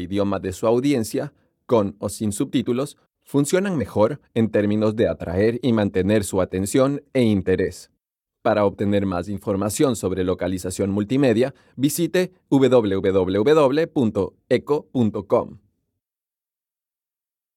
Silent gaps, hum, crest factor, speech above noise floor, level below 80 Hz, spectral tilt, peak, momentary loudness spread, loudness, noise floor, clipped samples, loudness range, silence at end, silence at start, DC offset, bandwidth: none; none; 16 dB; over 70 dB; -54 dBFS; -6 dB/octave; -4 dBFS; 7 LU; -21 LUFS; under -90 dBFS; under 0.1%; 4 LU; 2 s; 0 s; under 0.1%; 16.5 kHz